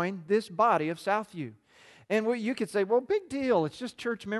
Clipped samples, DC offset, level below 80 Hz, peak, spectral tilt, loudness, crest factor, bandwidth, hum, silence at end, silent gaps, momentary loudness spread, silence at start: under 0.1%; under 0.1%; -70 dBFS; -12 dBFS; -6 dB/octave; -29 LUFS; 16 dB; 12.5 kHz; none; 0 s; none; 10 LU; 0 s